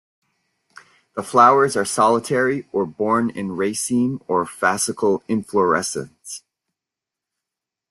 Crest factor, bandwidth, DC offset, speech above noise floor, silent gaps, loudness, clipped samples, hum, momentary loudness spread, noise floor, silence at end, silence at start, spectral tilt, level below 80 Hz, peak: 20 dB; 12.5 kHz; under 0.1%; 67 dB; none; -19 LUFS; under 0.1%; none; 17 LU; -86 dBFS; 1.55 s; 1.15 s; -4.5 dB/octave; -64 dBFS; -2 dBFS